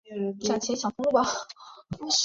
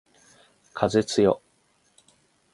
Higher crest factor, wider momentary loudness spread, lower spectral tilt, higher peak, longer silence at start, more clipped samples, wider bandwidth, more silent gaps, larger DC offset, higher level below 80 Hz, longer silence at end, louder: second, 18 dB vs 24 dB; first, 17 LU vs 12 LU; second, -3 dB/octave vs -5.5 dB/octave; second, -10 dBFS vs -4 dBFS; second, 0.05 s vs 0.75 s; neither; second, 7.8 kHz vs 11.5 kHz; neither; neither; about the same, -62 dBFS vs -58 dBFS; second, 0 s vs 1.15 s; second, -28 LUFS vs -24 LUFS